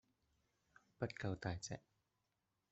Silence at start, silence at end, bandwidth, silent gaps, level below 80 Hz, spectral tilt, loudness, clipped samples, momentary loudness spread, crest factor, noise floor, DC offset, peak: 1 s; 0.95 s; 8 kHz; none; -72 dBFS; -5.5 dB/octave; -47 LUFS; under 0.1%; 7 LU; 24 dB; -88 dBFS; under 0.1%; -26 dBFS